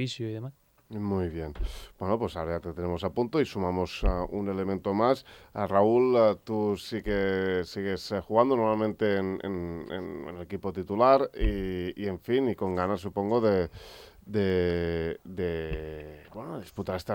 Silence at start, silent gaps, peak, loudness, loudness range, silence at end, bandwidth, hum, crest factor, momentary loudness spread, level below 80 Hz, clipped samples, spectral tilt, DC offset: 0 s; none; -8 dBFS; -29 LUFS; 5 LU; 0 s; 16.5 kHz; none; 20 dB; 15 LU; -42 dBFS; under 0.1%; -7 dB/octave; under 0.1%